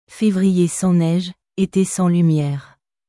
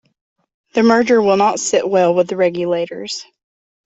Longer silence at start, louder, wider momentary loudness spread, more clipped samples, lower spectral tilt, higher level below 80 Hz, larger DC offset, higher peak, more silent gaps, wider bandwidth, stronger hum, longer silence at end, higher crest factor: second, 0.1 s vs 0.75 s; second, -18 LUFS vs -15 LUFS; second, 8 LU vs 12 LU; neither; first, -6.5 dB/octave vs -4.5 dB/octave; first, -54 dBFS vs -60 dBFS; neither; second, -6 dBFS vs -2 dBFS; neither; first, 12 kHz vs 8.4 kHz; neither; second, 0.45 s vs 0.65 s; about the same, 12 dB vs 14 dB